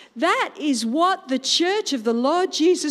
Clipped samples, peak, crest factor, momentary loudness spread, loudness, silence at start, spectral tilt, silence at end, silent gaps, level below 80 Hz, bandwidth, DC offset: under 0.1%; -6 dBFS; 14 dB; 4 LU; -21 LUFS; 0 s; -2 dB/octave; 0 s; none; -80 dBFS; 14.5 kHz; under 0.1%